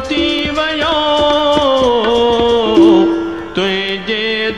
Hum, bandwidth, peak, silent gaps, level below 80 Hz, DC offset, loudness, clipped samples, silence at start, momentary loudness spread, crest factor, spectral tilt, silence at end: none; 10 kHz; 0 dBFS; none; -36 dBFS; 0.8%; -12 LUFS; under 0.1%; 0 s; 8 LU; 12 dB; -5 dB/octave; 0 s